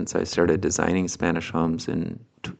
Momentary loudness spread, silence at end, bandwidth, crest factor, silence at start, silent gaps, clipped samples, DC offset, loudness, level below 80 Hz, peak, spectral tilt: 8 LU; 0.05 s; 9.2 kHz; 22 dB; 0 s; none; under 0.1%; under 0.1%; -24 LUFS; -48 dBFS; -4 dBFS; -5 dB/octave